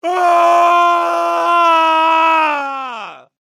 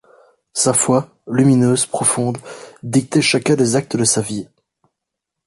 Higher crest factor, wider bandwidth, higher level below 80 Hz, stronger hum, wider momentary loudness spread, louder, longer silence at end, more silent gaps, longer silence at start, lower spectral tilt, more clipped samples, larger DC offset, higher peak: about the same, 12 dB vs 16 dB; first, 14.5 kHz vs 11.5 kHz; second, -82 dBFS vs -56 dBFS; neither; about the same, 13 LU vs 12 LU; first, -12 LUFS vs -16 LUFS; second, 0.3 s vs 1 s; neither; second, 0.05 s vs 0.55 s; second, -1 dB/octave vs -4.5 dB/octave; neither; neither; about the same, -2 dBFS vs -2 dBFS